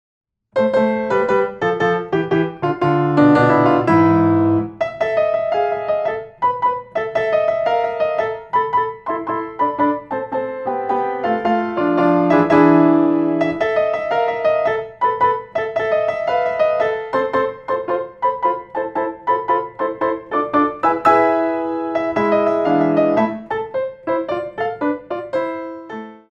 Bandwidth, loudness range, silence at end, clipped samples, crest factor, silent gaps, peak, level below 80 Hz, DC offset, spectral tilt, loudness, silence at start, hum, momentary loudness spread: 7.4 kHz; 5 LU; 0.15 s; under 0.1%; 16 dB; none; 0 dBFS; -54 dBFS; under 0.1%; -8 dB/octave; -18 LUFS; 0.55 s; none; 10 LU